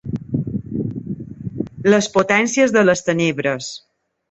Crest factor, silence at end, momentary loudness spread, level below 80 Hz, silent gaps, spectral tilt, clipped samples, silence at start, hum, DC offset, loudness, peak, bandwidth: 18 dB; 0.55 s; 15 LU; -50 dBFS; none; -5 dB/octave; under 0.1%; 0.05 s; none; under 0.1%; -18 LUFS; -2 dBFS; 8.2 kHz